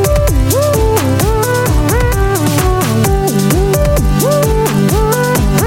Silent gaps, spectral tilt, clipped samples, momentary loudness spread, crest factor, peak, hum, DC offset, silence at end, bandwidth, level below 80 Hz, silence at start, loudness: none; -5.5 dB/octave; under 0.1%; 1 LU; 10 dB; 0 dBFS; none; under 0.1%; 0 s; 17 kHz; -18 dBFS; 0 s; -12 LUFS